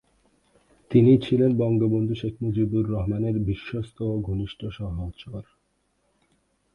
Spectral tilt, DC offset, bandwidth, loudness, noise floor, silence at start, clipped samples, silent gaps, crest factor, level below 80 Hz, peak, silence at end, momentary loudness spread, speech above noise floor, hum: -10 dB/octave; under 0.1%; 5.4 kHz; -24 LUFS; -71 dBFS; 0.9 s; under 0.1%; none; 18 dB; -44 dBFS; -6 dBFS; 1.3 s; 15 LU; 47 dB; none